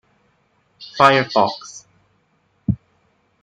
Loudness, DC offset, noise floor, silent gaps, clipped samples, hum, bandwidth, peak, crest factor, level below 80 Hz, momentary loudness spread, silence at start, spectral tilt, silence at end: -18 LUFS; under 0.1%; -63 dBFS; none; under 0.1%; none; 12.5 kHz; -2 dBFS; 20 dB; -50 dBFS; 25 LU; 0.8 s; -5 dB/octave; 0.65 s